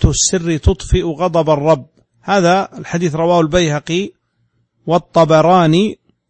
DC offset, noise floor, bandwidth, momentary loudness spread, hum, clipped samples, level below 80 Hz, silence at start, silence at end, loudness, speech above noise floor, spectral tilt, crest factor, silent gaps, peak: under 0.1%; -63 dBFS; 8.8 kHz; 10 LU; none; under 0.1%; -28 dBFS; 0 s; 0.35 s; -14 LUFS; 49 dB; -5 dB/octave; 14 dB; none; 0 dBFS